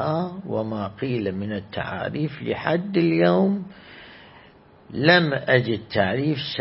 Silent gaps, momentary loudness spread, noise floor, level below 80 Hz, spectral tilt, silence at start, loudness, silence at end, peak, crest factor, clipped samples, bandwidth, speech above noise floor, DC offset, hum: none; 12 LU; -51 dBFS; -58 dBFS; -10.5 dB/octave; 0 s; -23 LUFS; 0 s; -2 dBFS; 22 dB; under 0.1%; 5.8 kHz; 28 dB; under 0.1%; none